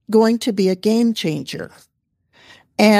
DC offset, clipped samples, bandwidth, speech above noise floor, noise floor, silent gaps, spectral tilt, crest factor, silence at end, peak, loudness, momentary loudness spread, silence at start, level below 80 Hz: under 0.1%; under 0.1%; 15 kHz; 43 dB; -61 dBFS; none; -5.5 dB/octave; 16 dB; 0 s; -2 dBFS; -18 LUFS; 15 LU; 0.1 s; -64 dBFS